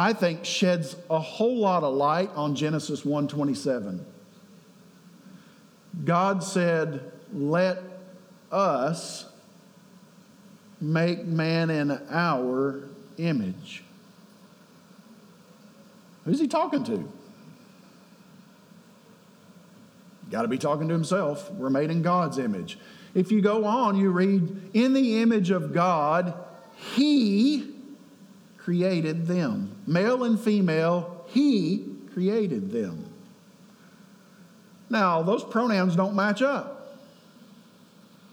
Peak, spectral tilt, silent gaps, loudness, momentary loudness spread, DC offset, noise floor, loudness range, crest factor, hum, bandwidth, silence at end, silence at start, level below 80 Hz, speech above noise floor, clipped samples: -8 dBFS; -6.5 dB/octave; none; -25 LUFS; 16 LU; under 0.1%; -54 dBFS; 8 LU; 18 dB; none; 14 kHz; 1.35 s; 0 s; -82 dBFS; 29 dB; under 0.1%